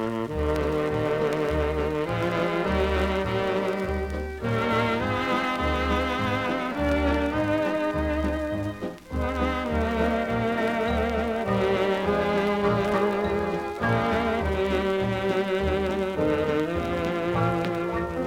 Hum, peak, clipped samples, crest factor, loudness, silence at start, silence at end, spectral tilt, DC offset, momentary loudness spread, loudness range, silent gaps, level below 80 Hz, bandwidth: none; -10 dBFS; under 0.1%; 16 dB; -26 LUFS; 0 s; 0 s; -6.5 dB/octave; under 0.1%; 4 LU; 2 LU; none; -38 dBFS; 16.5 kHz